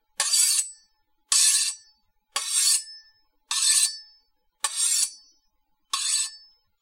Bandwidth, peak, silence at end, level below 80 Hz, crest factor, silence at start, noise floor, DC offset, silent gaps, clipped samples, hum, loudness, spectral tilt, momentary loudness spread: 16 kHz; -6 dBFS; 0.45 s; -76 dBFS; 20 dB; 0.2 s; -72 dBFS; under 0.1%; none; under 0.1%; none; -22 LUFS; 7 dB/octave; 13 LU